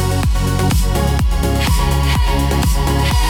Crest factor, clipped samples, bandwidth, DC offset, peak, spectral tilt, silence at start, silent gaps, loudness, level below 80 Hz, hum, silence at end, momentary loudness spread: 10 dB; under 0.1%; 17.5 kHz; under 0.1%; -4 dBFS; -5 dB/octave; 0 s; none; -16 LUFS; -16 dBFS; none; 0 s; 1 LU